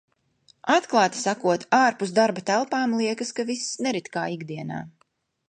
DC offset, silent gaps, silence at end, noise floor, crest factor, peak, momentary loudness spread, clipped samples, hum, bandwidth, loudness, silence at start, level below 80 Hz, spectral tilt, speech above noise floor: under 0.1%; none; 0.6 s; -68 dBFS; 20 dB; -6 dBFS; 13 LU; under 0.1%; none; 9.8 kHz; -24 LUFS; 0.65 s; -72 dBFS; -4 dB/octave; 45 dB